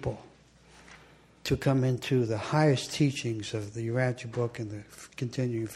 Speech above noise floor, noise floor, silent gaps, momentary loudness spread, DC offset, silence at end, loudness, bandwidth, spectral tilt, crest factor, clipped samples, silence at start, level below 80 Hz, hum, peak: 28 dB; -57 dBFS; none; 13 LU; under 0.1%; 0 s; -30 LUFS; 14 kHz; -6 dB/octave; 20 dB; under 0.1%; 0 s; -56 dBFS; none; -12 dBFS